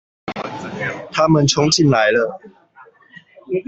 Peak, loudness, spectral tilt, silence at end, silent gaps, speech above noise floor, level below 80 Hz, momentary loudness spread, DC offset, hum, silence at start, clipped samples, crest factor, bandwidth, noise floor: -2 dBFS; -17 LUFS; -4.5 dB/octave; 0.05 s; none; 31 dB; -50 dBFS; 15 LU; under 0.1%; none; 0.25 s; under 0.1%; 16 dB; 8.2 kHz; -48 dBFS